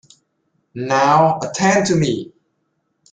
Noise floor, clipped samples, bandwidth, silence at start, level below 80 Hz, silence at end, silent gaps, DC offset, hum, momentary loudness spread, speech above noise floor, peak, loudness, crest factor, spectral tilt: -69 dBFS; under 0.1%; 9.6 kHz; 0.75 s; -56 dBFS; 0.9 s; none; under 0.1%; none; 17 LU; 54 dB; -2 dBFS; -16 LUFS; 16 dB; -5 dB/octave